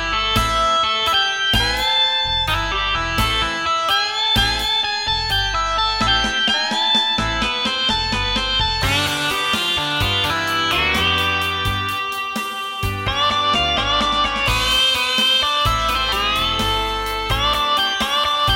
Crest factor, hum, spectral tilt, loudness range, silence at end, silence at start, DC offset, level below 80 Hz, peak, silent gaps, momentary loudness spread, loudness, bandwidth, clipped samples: 16 dB; none; -2.5 dB/octave; 2 LU; 0 s; 0 s; under 0.1%; -32 dBFS; -4 dBFS; none; 4 LU; -17 LUFS; 17 kHz; under 0.1%